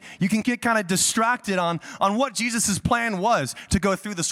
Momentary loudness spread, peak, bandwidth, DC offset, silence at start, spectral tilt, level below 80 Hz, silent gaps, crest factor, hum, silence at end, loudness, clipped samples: 5 LU; -8 dBFS; 16.5 kHz; under 0.1%; 0 s; -3.5 dB/octave; -46 dBFS; none; 16 dB; none; 0 s; -22 LUFS; under 0.1%